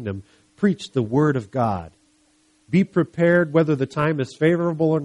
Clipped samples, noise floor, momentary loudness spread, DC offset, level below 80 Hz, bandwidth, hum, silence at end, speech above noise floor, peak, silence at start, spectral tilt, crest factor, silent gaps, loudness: under 0.1%; -61 dBFS; 7 LU; under 0.1%; -56 dBFS; 11 kHz; none; 0 s; 40 dB; -4 dBFS; 0 s; -8 dB/octave; 16 dB; none; -21 LUFS